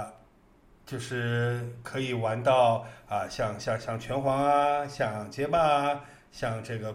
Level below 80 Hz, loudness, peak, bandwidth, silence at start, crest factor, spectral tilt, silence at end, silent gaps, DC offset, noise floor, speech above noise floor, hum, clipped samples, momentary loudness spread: -56 dBFS; -28 LUFS; -10 dBFS; 15 kHz; 0 s; 18 dB; -6 dB/octave; 0 s; none; under 0.1%; -59 dBFS; 31 dB; none; under 0.1%; 12 LU